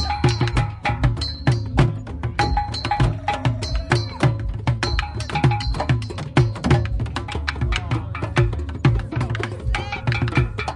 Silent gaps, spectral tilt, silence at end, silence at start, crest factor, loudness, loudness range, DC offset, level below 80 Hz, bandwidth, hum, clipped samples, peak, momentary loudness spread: none; -6 dB/octave; 0 s; 0 s; 18 dB; -22 LUFS; 1 LU; under 0.1%; -30 dBFS; 11 kHz; none; under 0.1%; -4 dBFS; 6 LU